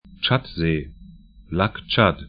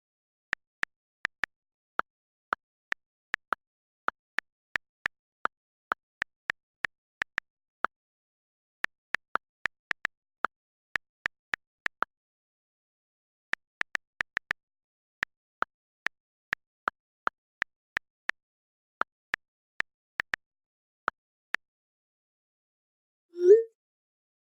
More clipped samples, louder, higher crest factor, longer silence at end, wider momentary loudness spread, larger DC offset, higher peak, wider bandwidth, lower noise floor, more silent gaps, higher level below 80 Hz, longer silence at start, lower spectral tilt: neither; first, -22 LUFS vs -34 LUFS; second, 22 dB vs 28 dB; second, 0 s vs 0.95 s; first, 10 LU vs 3 LU; neither; first, 0 dBFS vs -8 dBFS; second, 5.2 kHz vs 15 kHz; second, -45 dBFS vs under -90 dBFS; neither; first, -42 dBFS vs -70 dBFS; second, 0.1 s vs 23.35 s; first, -11 dB/octave vs -3.5 dB/octave